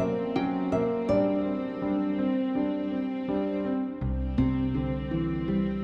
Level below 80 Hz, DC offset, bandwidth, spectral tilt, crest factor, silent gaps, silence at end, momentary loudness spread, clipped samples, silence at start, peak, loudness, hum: -40 dBFS; under 0.1%; 6.4 kHz; -9.5 dB/octave; 14 dB; none; 0 s; 5 LU; under 0.1%; 0 s; -14 dBFS; -28 LUFS; none